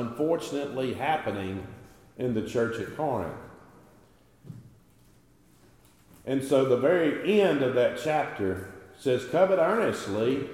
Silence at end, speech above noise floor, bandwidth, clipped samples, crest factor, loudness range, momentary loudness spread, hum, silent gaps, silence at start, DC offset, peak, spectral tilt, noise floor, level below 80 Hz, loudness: 0 s; 33 dB; 16 kHz; under 0.1%; 18 dB; 13 LU; 17 LU; none; none; 0 s; under 0.1%; -10 dBFS; -6 dB/octave; -60 dBFS; -64 dBFS; -27 LUFS